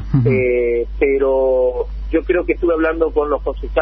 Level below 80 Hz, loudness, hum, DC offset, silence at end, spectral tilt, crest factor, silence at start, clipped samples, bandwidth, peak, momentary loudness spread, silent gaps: -28 dBFS; -17 LUFS; none; under 0.1%; 0 s; -11 dB/octave; 14 dB; 0 s; under 0.1%; 5 kHz; -2 dBFS; 6 LU; none